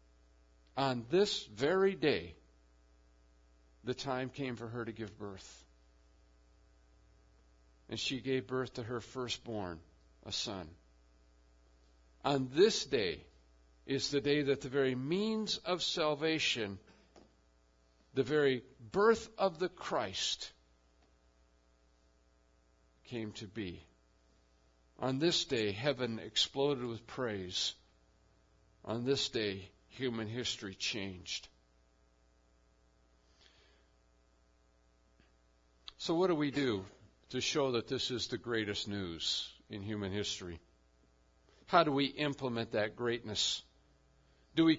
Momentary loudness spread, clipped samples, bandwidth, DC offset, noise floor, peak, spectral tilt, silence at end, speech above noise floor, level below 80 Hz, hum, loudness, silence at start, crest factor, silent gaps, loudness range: 14 LU; under 0.1%; 7.4 kHz; under 0.1%; -70 dBFS; -14 dBFS; -3 dB/octave; 0 s; 34 dB; -66 dBFS; none; -35 LUFS; 0.75 s; 24 dB; none; 10 LU